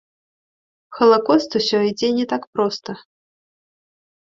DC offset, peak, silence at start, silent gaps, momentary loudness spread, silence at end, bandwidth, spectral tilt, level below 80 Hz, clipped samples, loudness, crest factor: under 0.1%; -2 dBFS; 0.9 s; 2.47-2.53 s; 14 LU; 1.25 s; 7.6 kHz; -5 dB/octave; -64 dBFS; under 0.1%; -18 LUFS; 20 dB